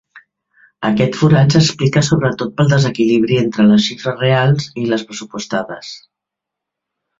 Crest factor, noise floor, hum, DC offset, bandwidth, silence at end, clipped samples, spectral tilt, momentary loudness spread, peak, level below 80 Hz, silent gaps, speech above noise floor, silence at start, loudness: 16 dB; -82 dBFS; none; under 0.1%; 7.8 kHz; 1.2 s; under 0.1%; -6 dB/octave; 13 LU; 0 dBFS; -48 dBFS; none; 68 dB; 0.8 s; -14 LUFS